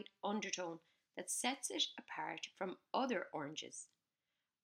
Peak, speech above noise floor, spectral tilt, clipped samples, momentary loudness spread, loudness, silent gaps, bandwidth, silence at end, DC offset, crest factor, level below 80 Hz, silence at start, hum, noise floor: -22 dBFS; over 47 dB; -2 dB/octave; under 0.1%; 13 LU; -42 LUFS; none; 15.5 kHz; 0.8 s; under 0.1%; 22 dB; under -90 dBFS; 0 s; none; under -90 dBFS